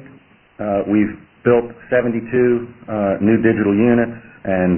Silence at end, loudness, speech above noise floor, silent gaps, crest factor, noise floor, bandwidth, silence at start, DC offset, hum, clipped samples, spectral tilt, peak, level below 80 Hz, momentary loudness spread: 0 s; -18 LUFS; 31 dB; none; 16 dB; -47 dBFS; 3.3 kHz; 0 s; under 0.1%; none; under 0.1%; -12.5 dB/octave; -2 dBFS; -50 dBFS; 8 LU